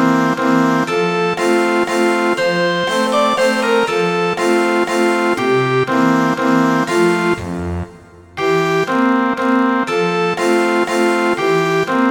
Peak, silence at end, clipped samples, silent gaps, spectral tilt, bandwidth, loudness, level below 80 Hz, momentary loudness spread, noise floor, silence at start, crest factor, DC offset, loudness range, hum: -2 dBFS; 0 s; under 0.1%; none; -5 dB/octave; 18.5 kHz; -15 LUFS; -48 dBFS; 2 LU; -39 dBFS; 0 s; 12 dB; under 0.1%; 2 LU; none